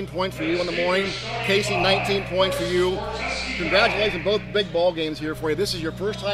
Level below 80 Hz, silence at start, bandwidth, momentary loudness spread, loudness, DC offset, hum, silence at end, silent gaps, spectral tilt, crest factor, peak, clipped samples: -42 dBFS; 0 s; 15.5 kHz; 7 LU; -23 LUFS; under 0.1%; none; 0 s; none; -4.5 dB/octave; 20 dB; -4 dBFS; under 0.1%